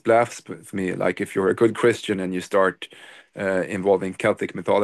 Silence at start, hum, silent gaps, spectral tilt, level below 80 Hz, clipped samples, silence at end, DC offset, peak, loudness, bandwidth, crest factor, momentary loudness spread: 0.05 s; none; none; -5.5 dB/octave; -58 dBFS; under 0.1%; 0 s; under 0.1%; -6 dBFS; -23 LUFS; 12.5 kHz; 16 dB; 12 LU